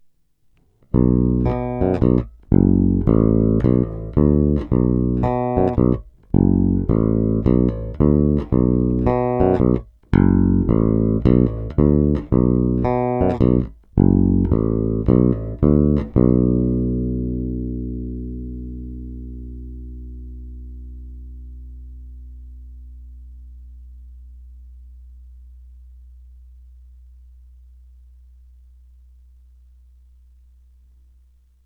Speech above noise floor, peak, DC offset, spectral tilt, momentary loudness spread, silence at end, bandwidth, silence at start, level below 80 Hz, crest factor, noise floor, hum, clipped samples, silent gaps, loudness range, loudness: 43 dB; 0 dBFS; under 0.1%; -12.5 dB/octave; 21 LU; 6.1 s; 4.2 kHz; 0.95 s; -28 dBFS; 20 dB; -59 dBFS; 50 Hz at -55 dBFS; under 0.1%; none; 19 LU; -18 LUFS